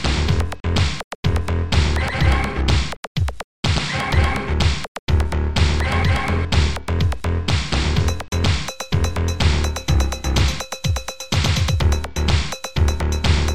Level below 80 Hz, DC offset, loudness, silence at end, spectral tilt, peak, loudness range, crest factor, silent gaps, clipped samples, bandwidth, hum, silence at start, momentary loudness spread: -24 dBFS; 3%; -20 LUFS; 0 s; -5 dB/octave; -4 dBFS; 1 LU; 14 dB; 1.04-1.23 s, 2.97-3.15 s, 3.44-3.63 s, 4.88-5.07 s; under 0.1%; 14.5 kHz; none; 0 s; 5 LU